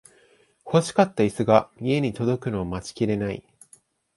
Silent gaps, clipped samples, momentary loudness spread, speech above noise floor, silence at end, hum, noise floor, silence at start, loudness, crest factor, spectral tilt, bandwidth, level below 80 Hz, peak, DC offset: none; under 0.1%; 9 LU; 37 dB; 0.75 s; none; -59 dBFS; 0.65 s; -24 LUFS; 22 dB; -6.5 dB/octave; 11.5 kHz; -52 dBFS; -2 dBFS; under 0.1%